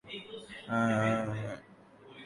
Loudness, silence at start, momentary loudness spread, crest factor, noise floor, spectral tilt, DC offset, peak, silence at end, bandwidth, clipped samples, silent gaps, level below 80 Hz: -33 LUFS; 0.05 s; 18 LU; 16 dB; -56 dBFS; -6.5 dB/octave; under 0.1%; -18 dBFS; 0 s; 11.5 kHz; under 0.1%; none; -66 dBFS